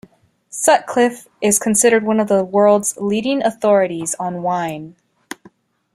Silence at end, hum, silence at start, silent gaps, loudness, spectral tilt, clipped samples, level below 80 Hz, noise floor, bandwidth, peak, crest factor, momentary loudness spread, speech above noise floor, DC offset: 1.05 s; none; 0.55 s; none; -16 LUFS; -3.5 dB/octave; under 0.1%; -60 dBFS; -50 dBFS; 15.5 kHz; -2 dBFS; 16 dB; 18 LU; 34 dB; under 0.1%